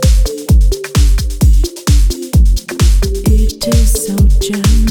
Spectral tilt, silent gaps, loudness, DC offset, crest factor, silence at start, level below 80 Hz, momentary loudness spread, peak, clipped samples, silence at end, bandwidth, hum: -5.5 dB/octave; none; -13 LUFS; under 0.1%; 8 dB; 0 s; -10 dBFS; 2 LU; 0 dBFS; under 0.1%; 0 s; 17.5 kHz; none